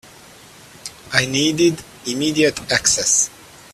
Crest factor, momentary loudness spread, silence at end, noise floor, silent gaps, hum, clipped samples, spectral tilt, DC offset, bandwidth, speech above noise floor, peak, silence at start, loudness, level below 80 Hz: 20 dB; 16 LU; 0.45 s; -44 dBFS; none; none; under 0.1%; -2.5 dB/octave; under 0.1%; 15 kHz; 26 dB; 0 dBFS; 0.85 s; -17 LUFS; -52 dBFS